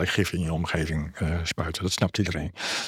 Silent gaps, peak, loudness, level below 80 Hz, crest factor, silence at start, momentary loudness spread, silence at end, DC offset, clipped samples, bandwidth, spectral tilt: none; -8 dBFS; -27 LUFS; -44 dBFS; 20 dB; 0 s; 4 LU; 0 s; under 0.1%; under 0.1%; 16 kHz; -4.5 dB/octave